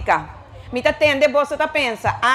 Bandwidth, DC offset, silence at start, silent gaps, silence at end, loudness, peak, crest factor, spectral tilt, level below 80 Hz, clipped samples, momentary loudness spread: 13 kHz; under 0.1%; 0 s; none; 0 s; -18 LUFS; -2 dBFS; 16 dB; -4 dB/octave; -44 dBFS; under 0.1%; 7 LU